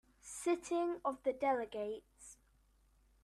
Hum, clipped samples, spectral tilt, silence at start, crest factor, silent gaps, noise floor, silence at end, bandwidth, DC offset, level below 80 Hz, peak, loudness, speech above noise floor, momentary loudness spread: none; under 0.1%; -3.5 dB/octave; 0.25 s; 18 dB; none; -71 dBFS; 0.9 s; 13 kHz; under 0.1%; -72 dBFS; -22 dBFS; -38 LUFS; 34 dB; 19 LU